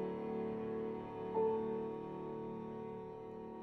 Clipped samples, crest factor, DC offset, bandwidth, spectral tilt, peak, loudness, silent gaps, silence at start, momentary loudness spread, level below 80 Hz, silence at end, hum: under 0.1%; 16 dB; under 0.1%; 5.8 kHz; -9.5 dB/octave; -26 dBFS; -42 LUFS; none; 0 s; 11 LU; -70 dBFS; 0 s; none